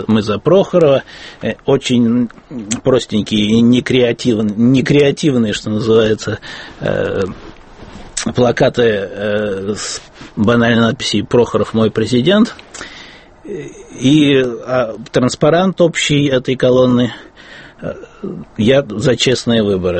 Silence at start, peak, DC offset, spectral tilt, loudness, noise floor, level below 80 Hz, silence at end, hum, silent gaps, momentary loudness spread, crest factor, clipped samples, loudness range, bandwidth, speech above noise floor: 0 s; 0 dBFS; under 0.1%; -5.5 dB/octave; -14 LUFS; -37 dBFS; -42 dBFS; 0 s; none; none; 16 LU; 14 dB; under 0.1%; 4 LU; 8.8 kHz; 24 dB